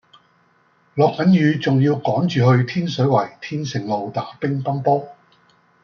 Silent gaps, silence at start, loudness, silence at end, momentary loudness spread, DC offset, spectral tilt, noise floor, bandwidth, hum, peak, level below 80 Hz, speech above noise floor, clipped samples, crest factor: none; 0.95 s; -19 LUFS; 0.7 s; 11 LU; under 0.1%; -7.5 dB/octave; -59 dBFS; 7 kHz; none; -4 dBFS; -62 dBFS; 41 dB; under 0.1%; 16 dB